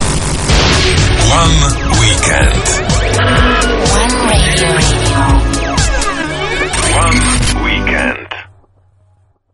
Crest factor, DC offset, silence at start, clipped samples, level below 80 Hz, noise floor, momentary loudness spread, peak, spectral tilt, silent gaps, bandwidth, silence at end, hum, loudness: 12 dB; under 0.1%; 0 s; under 0.1%; -16 dBFS; -52 dBFS; 6 LU; 0 dBFS; -3.5 dB/octave; none; 11.5 kHz; 1.1 s; none; -11 LUFS